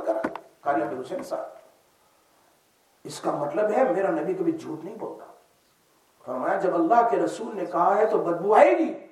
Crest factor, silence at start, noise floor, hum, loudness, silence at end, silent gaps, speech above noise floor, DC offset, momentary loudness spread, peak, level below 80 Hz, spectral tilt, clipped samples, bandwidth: 22 dB; 0 s; -63 dBFS; none; -24 LUFS; 0.05 s; none; 40 dB; under 0.1%; 17 LU; -4 dBFS; -80 dBFS; -6 dB/octave; under 0.1%; 13.5 kHz